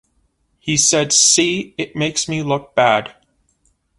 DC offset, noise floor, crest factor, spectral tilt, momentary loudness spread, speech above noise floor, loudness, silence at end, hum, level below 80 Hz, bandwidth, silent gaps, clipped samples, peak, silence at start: under 0.1%; -63 dBFS; 18 dB; -2 dB/octave; 13 LU; 47 dB; -15 LUFS; 0.9 s; none; -54 dBFS; 11.5 kHz; none; under 0.1%; 0 dBFS; 0.65 s